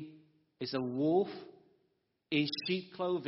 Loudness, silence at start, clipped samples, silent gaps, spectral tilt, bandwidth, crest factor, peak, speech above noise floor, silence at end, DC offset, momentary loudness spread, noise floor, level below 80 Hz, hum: -34 LUFS; 0 s; under 0.1%; none; -4 dB/octave; 5.8 kHz; 18 dB; -18 dBFS; 45 dB; 0 s; under 0.1%; 13 LU; -78 dBFS; -80 dBFS; none